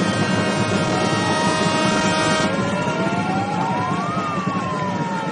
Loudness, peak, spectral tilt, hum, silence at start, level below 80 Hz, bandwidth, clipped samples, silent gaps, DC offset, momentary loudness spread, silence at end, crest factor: -20 LUFS; -6 dBFS; -5 dB/octave; none; 0 s; -50 dBFS; 10 kHz; under 0.1%; none; under 0.1%; 5 LU; 0 s; 14 dB